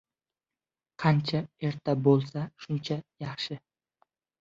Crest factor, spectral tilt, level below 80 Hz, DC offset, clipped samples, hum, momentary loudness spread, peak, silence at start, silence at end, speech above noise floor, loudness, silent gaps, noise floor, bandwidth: 22 dB; -7.5 dB/octave; -66 dBFS; under 0.1%; under 0.1%; none; 12 LU; -8 dBFS; 1 s; 0.85 s; over 62 dB; -29 LUFS; none; under -90 dBFS; 7.6 kHz